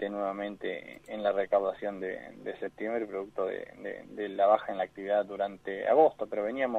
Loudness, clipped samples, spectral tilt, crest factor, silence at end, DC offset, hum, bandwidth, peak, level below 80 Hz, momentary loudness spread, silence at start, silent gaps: -31 LUFS; under 0.1%; -6.5 dB/octave; 20 dB; 0 s; under 0.1%; none; 8.2 kHz; -10 dBFS; -70 dBFS; 14 LU; 0 s; none